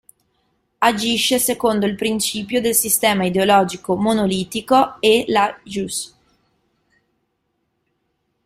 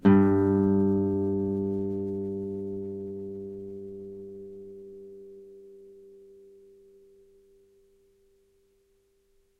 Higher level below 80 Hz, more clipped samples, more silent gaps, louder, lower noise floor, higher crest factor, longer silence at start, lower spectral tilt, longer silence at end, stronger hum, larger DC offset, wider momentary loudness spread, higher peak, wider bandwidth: first, -54 dBFS vs -62 dBFS; neither; neither; first, -18 LUFS vs -28 LUFS; about the same, -71 dBFS vs -68 dBFS; about the same, 18 dB vs 22 dB; first, 0.8 s vs 0.05 s; second, -3 dB/octave vs -11 dB/octave; second, 2.4 s vs 3.45 s; neither; neither; second, 9 LU vs 25 LU; first, -2 dBFS vs -8 dBFS; first, 16 kHz vs 3.9 kHz